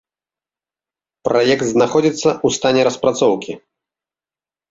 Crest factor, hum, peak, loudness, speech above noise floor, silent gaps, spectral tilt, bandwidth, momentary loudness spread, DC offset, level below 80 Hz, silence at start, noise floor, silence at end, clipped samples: 16 dB; none; -2 dBFS; -16 LUFS; over 75 dB; none; -4.5 dB/octave; 8 kHz; 10 LU; under 0.1%; -56 dBFS; 1.25 s; under -90 dBFS; 1.15 s; under 0.1%